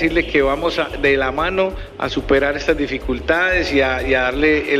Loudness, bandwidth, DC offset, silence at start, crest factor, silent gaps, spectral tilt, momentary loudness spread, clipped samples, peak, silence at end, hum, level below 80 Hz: -18 LUFS; 14 kHz; under 0.1%; 0 s; 14 dB; none; -5.5 dB/octave; 7 LU; under 0.1%; -4 dBFS; 0 s; none; -32 dBFS